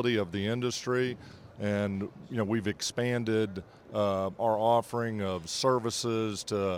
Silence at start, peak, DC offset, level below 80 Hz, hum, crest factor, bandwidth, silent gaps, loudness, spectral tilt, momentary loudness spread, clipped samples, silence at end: 0 s; -12 dBFS; under 0.1%; -68 dBFS; none; 18 dB; over 20 kHz; none; -31 LUFS; -5 dB/octave; 9 LU; under 0.1%; 0 s